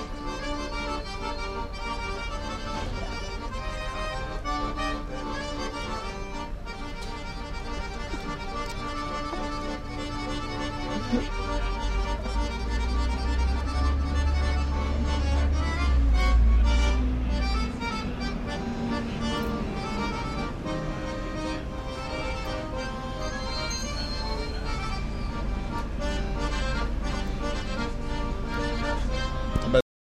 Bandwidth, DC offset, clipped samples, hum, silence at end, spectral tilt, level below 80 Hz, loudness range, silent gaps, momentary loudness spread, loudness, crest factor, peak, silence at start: 10.5 kHz; under 0.1%; under 0.1%; none; 0.4 s; -5.5 dB/octave; -30 dBFS; 8 LU; none; 8 LU; -30 LUFS; 20 dB; -8 dBFS; 0 s